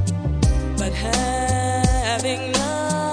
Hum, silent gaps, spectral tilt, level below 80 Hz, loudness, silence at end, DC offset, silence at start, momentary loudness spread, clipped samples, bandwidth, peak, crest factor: none; none; -4.5 dB/octave; -26 dBFS; -21 LUFS; 0 s; under 0.1%; 0 s; 3 LU; under 0.1%; 10.5 kHz; -4 dBFS; 16 dB